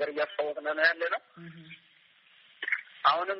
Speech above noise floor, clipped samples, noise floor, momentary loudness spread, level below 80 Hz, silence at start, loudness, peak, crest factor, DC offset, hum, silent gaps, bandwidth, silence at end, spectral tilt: 33 dB; under 0.1%; -62 dBFS; 23 LU; -84 dBFS; 0 s; -29 LUFS; -10 dBFS; 22 dB; under 0.1%; none; none; 5.8 kHz; 0 s; 0.5 dB/octave